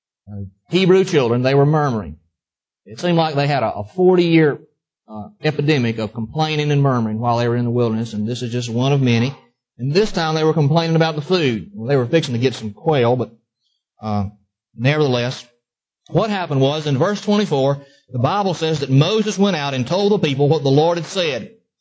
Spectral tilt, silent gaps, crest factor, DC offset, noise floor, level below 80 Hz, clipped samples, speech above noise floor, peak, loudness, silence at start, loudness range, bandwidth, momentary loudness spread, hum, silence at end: -6.5 dB/octave; none; 16 dB; under 0.1%; -89 dBFS; -50 dBFS; under 0.1%; 72 dB; -2 dBFS; -18 LUFS; 0.25 s; 3 LU; 8 kHz; 10 LU; none; 0.35 s